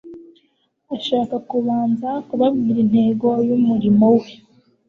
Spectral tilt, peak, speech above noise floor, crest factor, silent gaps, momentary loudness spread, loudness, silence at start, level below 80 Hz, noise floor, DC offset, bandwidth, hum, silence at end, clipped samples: -9 dB/octave; -4 dBFS; 48 dB; 14 dB; none; 8 LU; -18 LUFS; 0.05 s; -58 dBFS; -65 dBFS; under 0.1%; 6.4 kHz; none; 0.55 s; under 0.1%